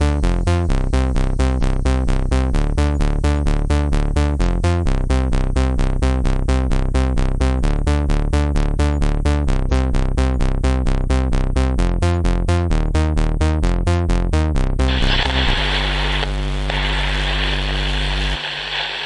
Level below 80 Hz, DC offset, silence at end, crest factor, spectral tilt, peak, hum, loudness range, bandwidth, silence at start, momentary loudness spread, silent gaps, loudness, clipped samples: -18 dBFS; 0.3%; 0 s; 12 dB; -6 dB/octave; -4 dBFS; none; 1 LU; 11 kHz; 0 s; 2 LU; none; -19 LUFS; under 0.1%